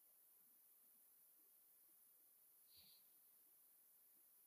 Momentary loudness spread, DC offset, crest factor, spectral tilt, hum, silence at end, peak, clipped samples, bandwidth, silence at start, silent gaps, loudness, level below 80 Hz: 3 LU; under 0.1%; 16 dB; 0 dB/octave; none; 0 s; -56 dBFS; under 0.1%; 15.5 kHz; 0 s; none; -69 LUFS; under -90 dBFS